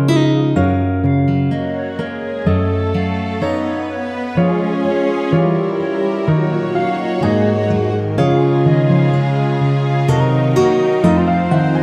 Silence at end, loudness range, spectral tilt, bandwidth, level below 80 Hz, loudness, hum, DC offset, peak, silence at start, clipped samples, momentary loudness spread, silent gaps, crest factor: 0 s; 4 LU; -8 dB/octave; 9.6 kHz; -44 dBFS; -16 LUFS; none; under 0.1%; -2 dBFS; 0 s; under 0.1%; 7 LU; none; 14 dB